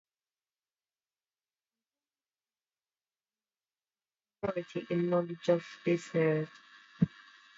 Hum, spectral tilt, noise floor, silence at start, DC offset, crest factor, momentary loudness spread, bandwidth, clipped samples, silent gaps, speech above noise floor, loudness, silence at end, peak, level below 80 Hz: none; -7.5 dB/octave; under -90 dBFS; 4.45 s; under 0.1%; 24 dB; 8 LU; 7.8 kHz; under 0.1%; none; over 58 dB; -33 LUFS; 0.5 s; -14 dBFS; -72 dBFS